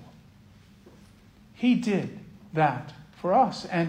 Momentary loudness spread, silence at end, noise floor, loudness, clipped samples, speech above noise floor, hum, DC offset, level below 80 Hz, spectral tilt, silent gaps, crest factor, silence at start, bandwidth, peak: 15 LU; 0 s; -54 dBFS; -26 LUFS; under 0.1%; 29 dB; none; under 0.1%; -62 dBFS; -7 dB/octave; none; 18 dB; 0 s; 9.8 kHz; -10 dBFS